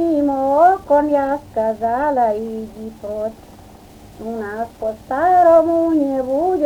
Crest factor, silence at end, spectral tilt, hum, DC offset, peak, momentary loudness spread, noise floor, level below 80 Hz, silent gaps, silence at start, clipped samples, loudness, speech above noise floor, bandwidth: 16 dB; 0 s; -7 dB/octave; none; under 0.1%; -2 dBFS; 15 LU; -41 dBFS; -48 dBFS; none; 0 s; under 0.1%; -17 LUFS; 24 dB; 18 kHz